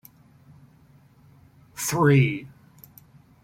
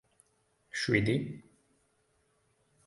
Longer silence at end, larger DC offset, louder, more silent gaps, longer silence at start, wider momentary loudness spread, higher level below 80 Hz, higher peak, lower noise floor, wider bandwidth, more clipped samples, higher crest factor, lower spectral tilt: second, 0.95 s vs 1.45 s; neither; first, -22 LUFS vs -31 LUFS; neither; first, 1.75 s vs 0.75 s; about the same, 18 LU vs 16 LU; about the same, -60 dBFS vs -62 dBFS; first, -6 dBFS vs -12 dBFS; second, -55 dBFS vs -73 dBFS; first, 16.5 kHz vs 11.5 kHz; neither; about the same, 20 dB vs 24 dB; about the same, -6 dB/octave vs -5.5 dB/octave